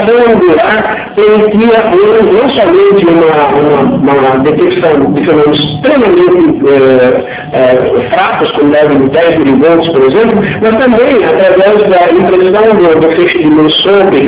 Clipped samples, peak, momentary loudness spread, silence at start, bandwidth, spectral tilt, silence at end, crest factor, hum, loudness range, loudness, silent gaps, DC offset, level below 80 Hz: 8%; 0 dBFS; 3 LU; 0 s; 4 kHz; -10 dB/octave; 0 s; 6 dB; none; 1 LU; -6 LUFS; none; under 0.1%; -38 dBFS